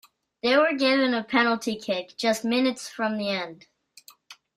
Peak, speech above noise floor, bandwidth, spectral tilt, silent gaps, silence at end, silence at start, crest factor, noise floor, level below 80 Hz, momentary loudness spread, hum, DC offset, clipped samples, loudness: -8 dBFS; 30 dB; 15.5 kHz; -3.5 dB/octave; none; 0.25 s; 0.45 s; 18 dB; -54 dBFS; -72 dBFS; 8 LU; none; under 0.1%; under 0.1%; -24 LUFS